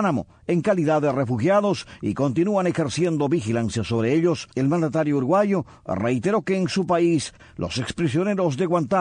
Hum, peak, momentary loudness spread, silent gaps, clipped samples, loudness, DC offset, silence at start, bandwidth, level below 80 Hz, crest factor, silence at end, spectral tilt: none; -8 dBFS; 7 LU; none; under 0.1%; -22 LUFS; under 0.1%; 0 s; 10 kHz; -54 dBFS; 14 dB; 0 s; -6.5 dB/octave